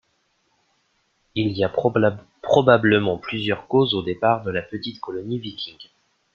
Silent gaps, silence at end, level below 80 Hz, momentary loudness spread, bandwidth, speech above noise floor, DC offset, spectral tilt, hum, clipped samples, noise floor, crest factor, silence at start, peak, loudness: none; 0.5 s; -58 dBFS; 15 LU; 7 kHz; 47 dB; under 0.1%; -7 dB/octave; none; under 0.1%; -68 dBFS; 20 dB; 1.35 s; -2 dBFS; -21 LUFS